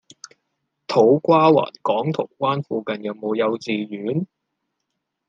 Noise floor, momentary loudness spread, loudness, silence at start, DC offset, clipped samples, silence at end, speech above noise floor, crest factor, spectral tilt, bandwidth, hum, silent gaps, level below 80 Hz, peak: -78 dBFS; 12 LU; -20 LUFS; 0.9 s; under 0.1%; under 0.1%; 1.05 s; 58 dB; 18 dB; -7 dB/octave; 7.8 kHz; none; none; -72 dBFS; -4 dBFS